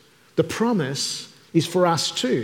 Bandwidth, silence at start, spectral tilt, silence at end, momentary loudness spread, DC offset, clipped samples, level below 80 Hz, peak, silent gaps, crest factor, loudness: 17.5 kHz; 0.35 s; -4.5 dB/octave; 0 s; 7 LU; under 0.1%; under 0.1%; -66 dBFS; -6 dBFS; none; 18 dB; -23 LUFS